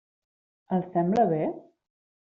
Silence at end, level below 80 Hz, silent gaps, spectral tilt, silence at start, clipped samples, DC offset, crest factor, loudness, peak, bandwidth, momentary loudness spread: 0.7 s; -68 dBFS; none; -8.5 dB/octave; 0.7 s; under 0.1%; under 0.1%; 18 dB; -26 LUFS; -12 dBFS; 7.2 kHz; 9 LU